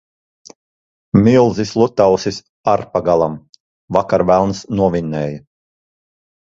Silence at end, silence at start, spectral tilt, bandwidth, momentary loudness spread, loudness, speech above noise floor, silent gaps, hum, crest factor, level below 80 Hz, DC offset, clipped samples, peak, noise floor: 1.1 s; 1.15 s; -7 dB/octave; 7.8 kHz; 11 LU; -16 LUFS; over 76 dB; 2.49-2.64 s, 3.49-3.53 s, 3.60-3.88 s; none; 16 dB; -44 dBFS; under 0.1%; under 0.1%; 0 dBFS; under -90 dBFS